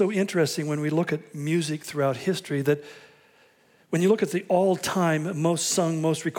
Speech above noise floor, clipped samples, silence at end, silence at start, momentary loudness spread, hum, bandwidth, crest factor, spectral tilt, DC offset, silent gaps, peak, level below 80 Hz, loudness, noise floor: 35 dB; under 0.1%; 0 s; 0 s; 6 LU; none; 18 kHz; 16 dB; -5 dB/octave; under 0.1%; none; -8 dBFS; -74 dBFS; -25 LUFS; -60 dBFS